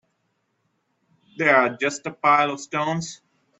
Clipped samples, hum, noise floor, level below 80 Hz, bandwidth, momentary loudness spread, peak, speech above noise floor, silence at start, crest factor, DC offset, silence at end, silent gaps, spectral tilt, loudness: under 0.1%; none; -72 dBFS; -70 dBFS; 8.4 kHz; 9 LU; -2 dBFS; 51 dB; 1.4 s; 22 dB; under 0.1%; 0.45 s; none; -4 dB/octave; -21 LUFS